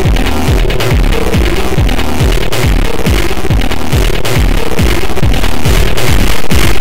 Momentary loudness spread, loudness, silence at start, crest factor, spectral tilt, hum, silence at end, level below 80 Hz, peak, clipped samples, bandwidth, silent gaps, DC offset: 2 LU; -12 LUFS; 0 s; 10 dB; -5 dB/octave; none; 0 s; -12 dBFS; 0 dBFS; under 0.1%; 16.5 kHz; none; 30%